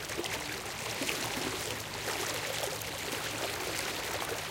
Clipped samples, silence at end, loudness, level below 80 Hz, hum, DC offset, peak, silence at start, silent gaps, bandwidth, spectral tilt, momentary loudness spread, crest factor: under 0.1%; 0 s; -34 LUFS; -58 dBFS; none; under 0.1%; -16 dBFS; 0 s; none; 17 kHz; -2 dB/octave; 3 LU; 20 dB